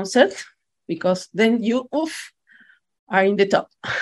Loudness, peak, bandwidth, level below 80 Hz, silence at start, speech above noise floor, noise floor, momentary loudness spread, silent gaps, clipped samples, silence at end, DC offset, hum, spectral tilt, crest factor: -21 LUFS; -2 dBFS; 12.5 kHz; -66 dBFS; 0 s; 34 dB; -54 dBFS; 17 LU; 2.99-3.07 s; under 0.1%; 0 s; under 0.1%; none; -4.5 dB/octave; 20 dB